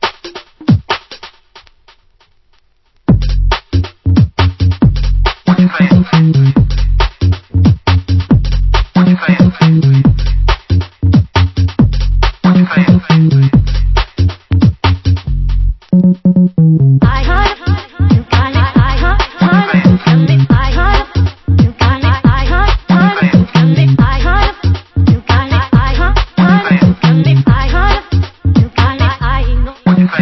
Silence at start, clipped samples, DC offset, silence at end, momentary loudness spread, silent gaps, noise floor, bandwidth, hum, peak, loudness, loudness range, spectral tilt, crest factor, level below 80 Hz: 0 s; 0.2%; under 0.1%; 0 s; 7 LU; none; -52 dBFS; 6 kHz; none; 0 dBFS; -11 LUFS; 2 LU; -8 dB/octave; 10 dB; -16 dBFS